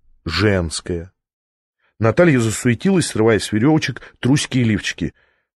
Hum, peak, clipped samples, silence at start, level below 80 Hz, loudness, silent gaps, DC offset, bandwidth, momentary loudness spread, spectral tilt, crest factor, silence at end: none; -2 dBFS; under 0.1%; 0.25 s; -42 dBFS; -18 LUFS; 1.33-1.73 s; under 0.1%; 12 kHz; 11 LU; -5.5 dB/octave; 16 dB; 0.45 s